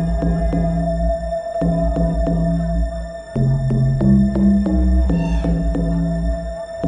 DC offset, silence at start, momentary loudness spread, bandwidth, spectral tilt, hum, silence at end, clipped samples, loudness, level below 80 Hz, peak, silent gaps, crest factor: under 0.1%; 0 s; 9 LU; 9.6 kHz; -9.5 dB/octave; none; 0 s; under 0.1%; -19 LUFS; -22 dBFS; -4 dBFS; none; 12 dB